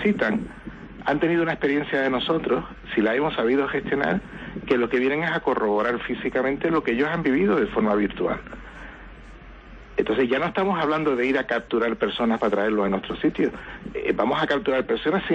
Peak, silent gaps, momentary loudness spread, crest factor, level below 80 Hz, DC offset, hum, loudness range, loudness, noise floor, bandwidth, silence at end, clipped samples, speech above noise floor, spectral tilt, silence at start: -8 dBFS; none; 9 LU; 16 dB; -48 dBFS; under 0.1%; none; 3 LU; -23 LUFS; -43 dBFS; 8 kHz; 0 s; under 0.1%; 20 dB; -7 dB/octave; 0 s